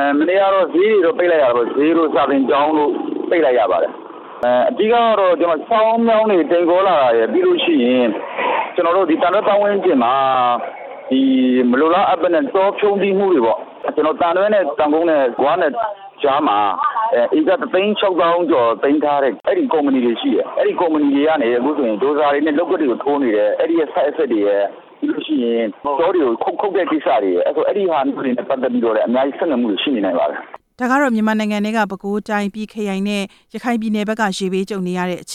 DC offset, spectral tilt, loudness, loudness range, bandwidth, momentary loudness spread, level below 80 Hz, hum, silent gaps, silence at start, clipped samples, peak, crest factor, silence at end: under 0.1%; -6 dB/octave; -16 LUFS; 4 LU; 12.5 kHz; 7 LU; -62 dBFS; none; none; 0 s; under 0.1%; -4 dBFS; 12 dB; 0 s